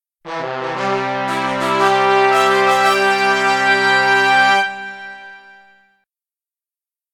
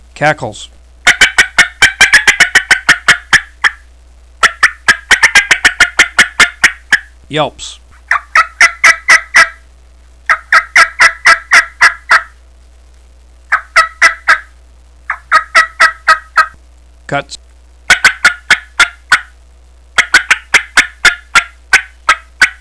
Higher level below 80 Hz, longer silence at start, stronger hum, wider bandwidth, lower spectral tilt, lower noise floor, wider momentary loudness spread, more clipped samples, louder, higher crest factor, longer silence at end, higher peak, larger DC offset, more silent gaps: second, -66 dBFS vs -38 dBFS; about the same, 0.25 s vs 0.2 s; neither; first, 19.5 kHz vs 11 kHz; first, -3 dB/octave vs 0 dB/octave; first, under -90 dBFS vs -40 dBFS; first, 16 LU vs 10 LU; second, under 0.1% vs 3%; second, -14 LUFS vs -8 LUFS; first, 16 dB vs 10 dB; first, 1.75 s vs 0.1 s; about the same, 0 dBFS vs 0 dBFS; second, under 0.1% vs 0.4%; neither